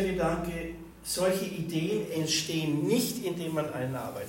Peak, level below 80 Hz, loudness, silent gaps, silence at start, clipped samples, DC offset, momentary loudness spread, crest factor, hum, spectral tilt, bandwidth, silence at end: -14 dBFS; -52 dBFS; -30 LUFS; none; 0 s; under 0.1%; under 0.1%; 7 LU; 16 dB; none; -4.5 dB/octave; 16.5 kHz; 0 s